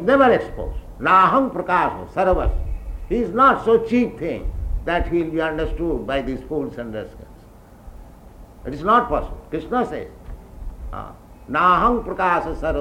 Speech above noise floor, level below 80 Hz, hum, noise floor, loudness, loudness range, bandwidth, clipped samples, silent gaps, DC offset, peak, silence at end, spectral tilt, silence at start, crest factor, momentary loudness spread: 25 dB; -32 dBFS; none; -45 dBFS; -20 LUFS; 7 LU; 16 kHz; under 0.1%; none; under 0.1%; -4 dBFS; 0 s; -7 dB/octave; 0 s; 18 dB; 19 LU